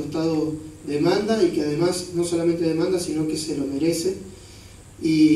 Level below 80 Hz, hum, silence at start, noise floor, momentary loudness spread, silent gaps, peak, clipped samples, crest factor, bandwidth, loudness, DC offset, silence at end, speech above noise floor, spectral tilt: -52 dBFS; none; 0 s; -44 dBFS; 10 LU; none; -6 dBFS; under 0.1%; 16 dB; 13 kHz; -23 LUFS; under 0.1%; 0 s; 22 dB; -5.5 dB/octave